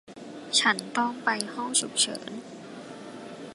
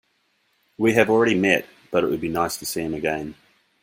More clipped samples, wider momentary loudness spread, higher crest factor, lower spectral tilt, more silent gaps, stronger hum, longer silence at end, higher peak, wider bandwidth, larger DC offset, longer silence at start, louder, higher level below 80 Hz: neither; first, 20 LU vs 9 LU; about the same, 24 dB vs 22 dB; second, -1 dB/octave vs -4.5 dB/octave; neither; neither; second, 0 s vs 0.5 s; second, -6 dBFS vs -2 dBFS; second, 12 kHz vs 16.5 kHz; neither; second, 0.05 s vs 0.8 s; second, -26 LUFS vs -22 LUFS; second, -78 dBFS vs -56 dBFS